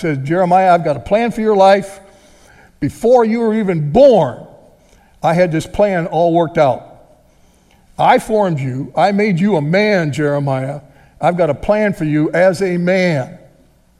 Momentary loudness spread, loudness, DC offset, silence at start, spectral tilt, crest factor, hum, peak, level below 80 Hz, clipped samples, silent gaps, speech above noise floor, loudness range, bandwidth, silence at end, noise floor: 10 LU; -14 LUFS; under 0.1%; 0 s; -7 dB/octave; 14 dB; none; 0 dBFS; -44 dBFS; under 0.1%; none; 37 dB; 3 LU; 13.5 kHz; 0.65 s; -50 dBFS